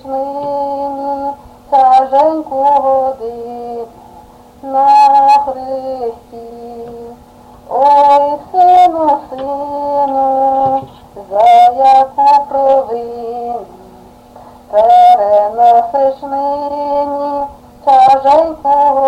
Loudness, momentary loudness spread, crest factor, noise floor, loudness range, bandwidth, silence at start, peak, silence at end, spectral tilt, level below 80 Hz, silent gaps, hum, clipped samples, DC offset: -11 LUFS; 17 LU; 12 dB; -38 dBFS; 3 LU; 9.8 kHz; 0.05 s; 0 dBFS; 0 s; -5 dB/octave; -48 dBFS; none; none; under 0.1%; under 0.1%